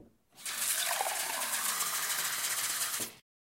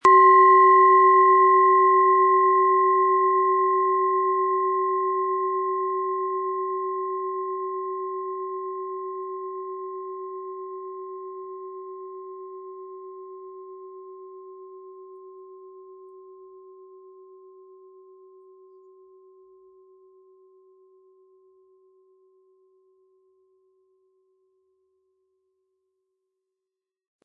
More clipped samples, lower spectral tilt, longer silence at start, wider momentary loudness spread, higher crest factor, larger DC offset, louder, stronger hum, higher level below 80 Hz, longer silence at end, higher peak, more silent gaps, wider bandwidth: neither; second, 1.5 dB/octave vs -5 dB/octave; about the same, 0 s vs 0.05 s; second, 7 LU vs 26 LU; about the same, 18 dB vs 20 dB; neither; second, -31 LUFS vs -20 LUFS; neither; about the same, -80 dBFS vs -82 dBFS; second, 0.35 s vs 11.2 s; second, -18 dBFS vs -4 dBFS; neither; first, 16 kHz vs 7.4 kHz